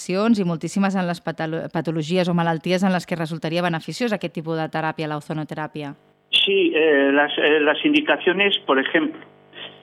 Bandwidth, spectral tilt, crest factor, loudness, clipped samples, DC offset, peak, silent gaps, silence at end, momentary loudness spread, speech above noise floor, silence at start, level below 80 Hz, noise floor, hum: 13 kHz; -5.5 dB/octave; 16 dB; -21 LUFS; under 0.1%; under 0.1%; -4 dBFS; none; 0.1 s; 11 LU; 20 dB; 0 s; -68 dBFS; -40 dBFS; none